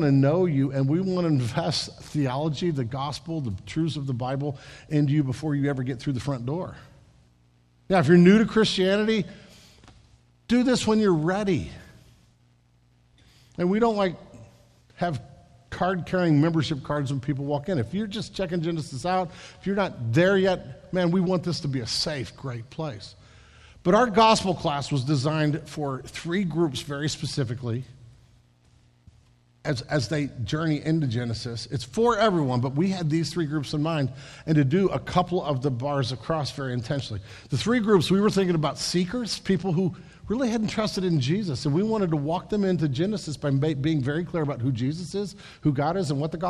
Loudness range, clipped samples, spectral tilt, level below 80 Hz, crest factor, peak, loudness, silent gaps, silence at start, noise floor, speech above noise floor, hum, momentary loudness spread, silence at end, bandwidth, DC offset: 7 LU; under 0.1%; -6.5 dB/octave; -52 dBFS; 20 dB; -6 dBFS; -25 LUFS; none; 0 s; -61 dBFS; 37 dB; none; 11 LU; 0 s; 12.5 kHz; under 0.1%